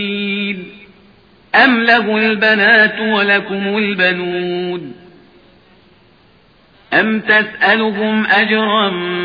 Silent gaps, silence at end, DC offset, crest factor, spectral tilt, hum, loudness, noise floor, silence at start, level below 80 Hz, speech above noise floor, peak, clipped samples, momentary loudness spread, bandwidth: none; 0 s; under 0.1%; 16 dB; -7 dB/octave; none; -13 LUFS; -49 dBFS; 0 s; -58 dBFS; 36 dB; 0 dBFS; under 0.1%; 10 LU; 5.2 kHz